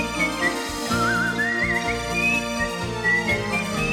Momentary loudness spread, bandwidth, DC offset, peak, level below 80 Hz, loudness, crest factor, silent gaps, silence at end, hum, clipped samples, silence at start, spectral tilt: 4 LU; 18 kHz; under 0.1%; -10 dBFS; -40 dBFS; -22 LUFS; 14 dB; none; 0 s; none; under 0.1%; 0 s; -4 dB/octave